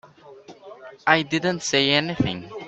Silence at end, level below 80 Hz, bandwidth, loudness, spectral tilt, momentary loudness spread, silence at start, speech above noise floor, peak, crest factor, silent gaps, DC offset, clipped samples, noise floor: 0 s; -56 dBFS; 8.4 kHz; -21 LUFS; -4 dB/octave; 13 LU; 0.25 s; 24 dB; 0 dBFS; 24 dB; none; under 0.1%; under 0.1%; -46 dBFS